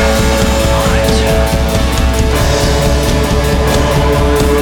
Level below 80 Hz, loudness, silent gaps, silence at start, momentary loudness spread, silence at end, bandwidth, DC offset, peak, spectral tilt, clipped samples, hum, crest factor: -14 dBFS; -12 LUFS; none; 0 s; 2 LU; 0 s; 19.5 kHz; under 0.1%; 0 dBFS; -5 dB/octave; under 0.1%; none; 10 dB